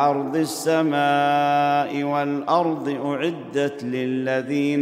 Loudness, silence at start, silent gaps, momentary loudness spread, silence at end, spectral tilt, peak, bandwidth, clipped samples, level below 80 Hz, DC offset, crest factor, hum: -22 LUFS; 0 s; none; 6 LU; 0 s; -5.5 dB/octave; -6 dBFS; 16 kHz; under 0.1%; -74 dBFS; under 0.1%; 16 dB; none